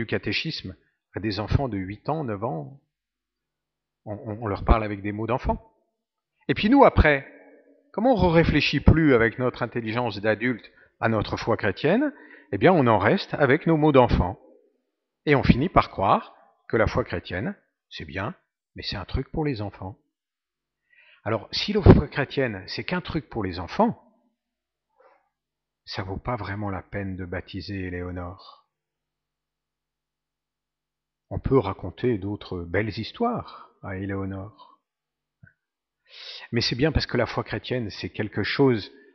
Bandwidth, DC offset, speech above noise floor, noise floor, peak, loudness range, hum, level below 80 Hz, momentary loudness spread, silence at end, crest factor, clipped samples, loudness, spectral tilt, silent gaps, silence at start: 6.4 kHz; under 0.1%; 66 dB; -89 dBFS; 0 dBFS; 12 LU; none; -38 dBFS; 16 LU; 0.25 s; 26 dB; under 0.1%; -24 LUFS; -5 dB/octave; none; 0 s